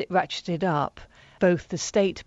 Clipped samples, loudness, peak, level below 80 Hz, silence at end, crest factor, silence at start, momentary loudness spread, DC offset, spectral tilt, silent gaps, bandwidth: under 0.1%; -26 LUFS; -6 dBFS; -56 dBFS; 0.05 s; 18 dB; 0 s; 5 LU; under 0.1%; -5 dB/octave; none; 8 kHz